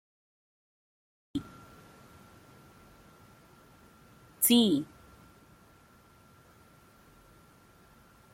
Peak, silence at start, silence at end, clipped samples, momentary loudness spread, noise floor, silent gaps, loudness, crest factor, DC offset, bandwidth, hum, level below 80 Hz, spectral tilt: -10 dBFS; 1.35 s; 3.5 s; under 0.1%; 31 LU; -60 dBFS; none; -27 LUFS; 26 dB; under 0.1%; 16.5 kHz; none; -68 dBFS; -3.5 dB/octave